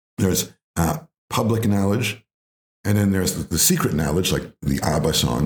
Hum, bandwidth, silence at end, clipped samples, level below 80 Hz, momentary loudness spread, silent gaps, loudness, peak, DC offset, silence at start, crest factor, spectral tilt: none; over 20 kHz; 0 s; under 0.1%; -42 dBFS; 9 LU; 0.64-0.74 s, 1.18-1.28 s, 2.34-2.84 s; -21 LUFS; -4 dBFS; under 0.1%; 0.2 s; 18 dB; -4.5 dB/octave